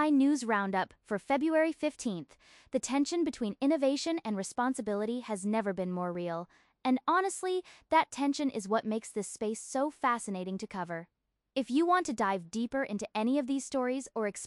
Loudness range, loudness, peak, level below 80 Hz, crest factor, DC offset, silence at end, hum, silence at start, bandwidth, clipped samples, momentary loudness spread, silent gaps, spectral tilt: 2 LU; -32 LUFS; -14 dBFS; -70 dBFS; 16 dB; under 0.1%; 0 s; none; 0 s; 12 kHz; under 0.1%; 9 LU; none; -4.5 dB/octave